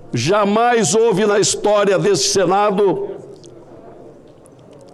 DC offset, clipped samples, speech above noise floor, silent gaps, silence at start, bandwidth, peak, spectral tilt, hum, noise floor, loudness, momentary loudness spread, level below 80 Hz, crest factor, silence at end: under 0.1%; under 0.1%; 28 dB; none; 0 s; 13 kHz; -4 dBFS; -3.5 dB/octave; none; -43 dBFS; -15 LUFS; 4 LU; -50 dBFS; 12 dB; 0.8 s